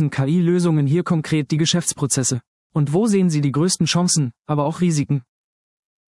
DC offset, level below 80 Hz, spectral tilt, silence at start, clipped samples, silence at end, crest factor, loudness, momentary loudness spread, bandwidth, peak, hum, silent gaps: under 0.1%; -60 dBFS; -5 dB/octave; 0 s; under 0.1%; 0.9 s; 14 dB; -19 LUFS; 6 LU; 12 kHz; -6 dBFS; none; 2.47-2.70 s, 4.39-4.45 s